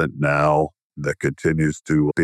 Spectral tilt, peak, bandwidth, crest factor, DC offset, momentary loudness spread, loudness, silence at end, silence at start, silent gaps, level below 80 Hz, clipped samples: -7 dB/octave; -6 dBFS; 11.5 kHz; 14 dB; under 0.1%; 10 LU; -21 LUFS; 0 s; 0 s; 0.83-0.90 s; -46 dBFS; under 0.1%